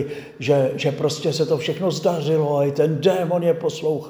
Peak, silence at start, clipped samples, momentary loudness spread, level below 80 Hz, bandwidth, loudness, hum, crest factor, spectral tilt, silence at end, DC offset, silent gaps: -4 dBFS; 0 s; under 0.1%; 4 LU; -64 dBFS; over 20 kHz; -21 LUFS; none; 16 dB; -6 dB/octave; 0 s; under 0.1%; none